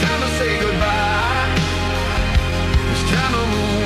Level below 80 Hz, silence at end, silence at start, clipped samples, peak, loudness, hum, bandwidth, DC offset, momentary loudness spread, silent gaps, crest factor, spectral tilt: -24 dBFS; 0 s; 0 s; under 0.1%; -2 dBFS; -18 LUFS; none; 14.5 kHz; under 0.1%; 2 LU; none; 16 dB; -5 dB/octave